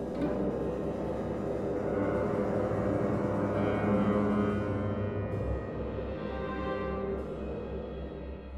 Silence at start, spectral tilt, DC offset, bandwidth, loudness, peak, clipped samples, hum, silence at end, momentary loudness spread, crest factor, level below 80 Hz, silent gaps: 0 s; -9 dB/octave; under 0.1%; 10 kHz; -32 LUFS; -16 dBFS; under 0.1%; none; 0 s; 9 LU; 14 dB; -44 dBFS; none